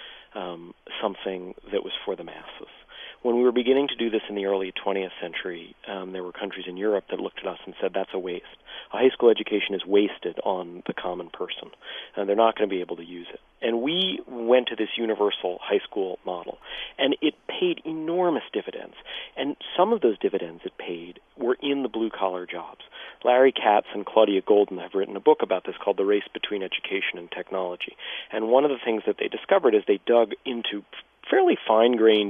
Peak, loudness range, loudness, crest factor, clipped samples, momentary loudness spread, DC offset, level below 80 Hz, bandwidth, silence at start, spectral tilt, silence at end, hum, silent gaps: -4 dBFS; 6 LU; -25 LUFS; 22 dB; under 0.1%; 16 LU; under 0.1%; -64 dBFS; 3.8 kHz; 0 s; -7.5 dB/octave; 0 s; none; none